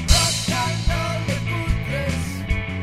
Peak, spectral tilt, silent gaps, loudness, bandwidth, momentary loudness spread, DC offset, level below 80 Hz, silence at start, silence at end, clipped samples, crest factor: -2 dBFS; -3.5 dB/octave; none; -22 LUFS; 16 kHz; 8 LU; under 0.1%; -26 dBFS; 0 s; 0 s; under 0.1%; 20 dB